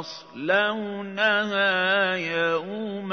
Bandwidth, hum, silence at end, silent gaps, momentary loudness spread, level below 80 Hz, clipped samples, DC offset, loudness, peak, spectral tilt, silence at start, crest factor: 6.6 kHz; none; 0 s; none; 11 LU; -78 dBFS; under 0.1%; under 0.1%; -24 LUFS; -8 dBFS; -4.5 dB/octave; 0 s; 16 dB